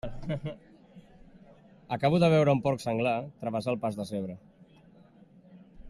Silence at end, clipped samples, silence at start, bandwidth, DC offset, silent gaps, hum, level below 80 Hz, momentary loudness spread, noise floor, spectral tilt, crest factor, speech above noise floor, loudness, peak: 0 s; under 0.1%; 0.05 s; 12.5 kHz; under 0.1%; none; none; -54 dBFS; 17 LU; -57 dBFS; -7.5 dB/octave; 18 dB; 29 dB; -29 LUFS; -12 dBFS